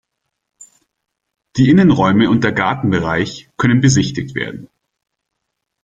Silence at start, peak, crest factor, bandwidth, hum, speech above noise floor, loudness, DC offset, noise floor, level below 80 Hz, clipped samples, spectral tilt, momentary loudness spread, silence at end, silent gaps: 1.55 s; 0 dBFS; 16 dB; 9.2 kHz; none; 62 dB; -14 LUFS; under 0.1%; -76 dBFS; -46 dBFS; under 0.1%; -6 dB/octave; 13 LU; 1.2 s; none